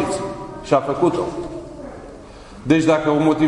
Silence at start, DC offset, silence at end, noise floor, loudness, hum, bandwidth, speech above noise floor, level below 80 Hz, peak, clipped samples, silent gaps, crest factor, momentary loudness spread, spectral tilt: 0 s; under 0.1%; 0 s; -39 dBFS; -19 LUFS; none; 11 kHz; 22 dB; -46 dBFS; -2 dBFS; under 0.1%; none; 18 dB; 22 LU; -6.5 dB/octave